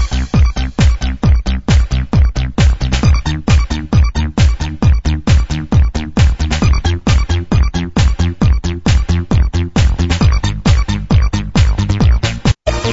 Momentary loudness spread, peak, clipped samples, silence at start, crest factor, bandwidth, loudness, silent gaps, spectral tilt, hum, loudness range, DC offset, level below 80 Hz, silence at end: 2 LU; 0 dBFS; under 0.1%; 0 s; 12 dB; 7.8 kHz; -14 LUFS; none; -6 dB/octave; none; 1 LU; 1%; -14 dBFS; 0 s